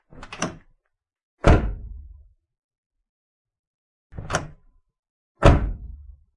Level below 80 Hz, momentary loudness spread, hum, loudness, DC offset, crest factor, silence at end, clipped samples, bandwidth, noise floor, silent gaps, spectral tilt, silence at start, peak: -30 dBFS; 25 LU; none; -22 LUFS; under 0.1%; 24 dB; 0.25 s; under 0.1%; 11.5 kHz; -63 dBFS; 1.23-1.38 s, 2.58-2.69 s, 2.78-2.90 s, 3.09-3.45 s, 3.59-4.10 s, 4.99-5.03 s, 5.10-5.35 s; -6 dB/octave; 0.2 s; -2 dBFS